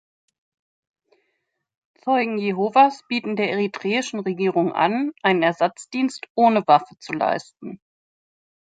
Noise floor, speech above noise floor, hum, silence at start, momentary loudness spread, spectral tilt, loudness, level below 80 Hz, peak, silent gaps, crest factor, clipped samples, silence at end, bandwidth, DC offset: -75 dBFS; 54 dB; none; 2.05 s; 10 LU; -5.5 dB/octave; -21 LUFS; -74 dBFS; -2 dBFS; 6.30-6.35 s; 20 dB; under 0.1%; 0.95 s; 9.4 kHz; under 0.1%